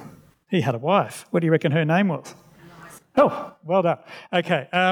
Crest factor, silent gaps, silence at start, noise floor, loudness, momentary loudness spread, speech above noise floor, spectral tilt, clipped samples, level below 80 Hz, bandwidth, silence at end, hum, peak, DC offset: 18 dB; none; 0 s; -46 dBFS; -22 LUFS; 6 LU; 25 dB; -6.5 dB/octave; under 0.1%; -70 dBFS; 15.5 kHz; 0 s; none; -4 dBFS; under 0.1%